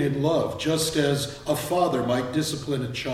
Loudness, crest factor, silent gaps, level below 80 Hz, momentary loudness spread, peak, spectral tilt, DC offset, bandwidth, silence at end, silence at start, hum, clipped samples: -25 LUFS; 16 dB; none; -52 dBFS; 5 LU; -10 dBFS; -5 dB/octave; under 0.1%; 16 kHz; 0 s; 0 s; none; under 0.1%